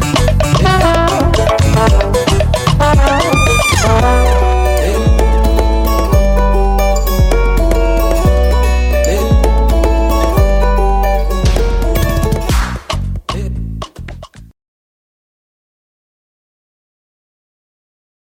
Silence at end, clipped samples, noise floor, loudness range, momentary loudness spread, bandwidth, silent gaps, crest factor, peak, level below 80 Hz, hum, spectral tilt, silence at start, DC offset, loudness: 3.95 s; under 0.1%; -30 dBFS; 10 LU; 9 LU; 17 kHz; none; 12 dB; 0 dBFS; -14 dBFS; none; -5.5 dB/octave; 0 s; under 0.1%; -12 LUFS